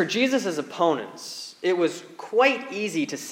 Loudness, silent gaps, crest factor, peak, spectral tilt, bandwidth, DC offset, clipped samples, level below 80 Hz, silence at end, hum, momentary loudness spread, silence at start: -24 LUFS; none; 20 dB; -6 dBFS; -3.5 dB/octave; 16.5 kHz; under 0.1%; under 0.1%; -84 dBFS; 0 s; none; 14 LU; 0 s